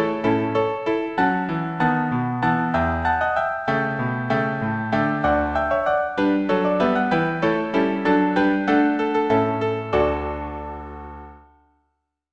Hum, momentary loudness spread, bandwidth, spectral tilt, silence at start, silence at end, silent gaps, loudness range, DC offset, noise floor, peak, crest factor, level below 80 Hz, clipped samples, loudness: none; 6 LU; 7.8 kHz; -8 dB/octave; 0 s; 0.95 s; none; 2 LU; under 0.1%; -74 dBFS; -6 dBFS; 16 dB; -42 dBFS; under 0.1%; -21 LUFS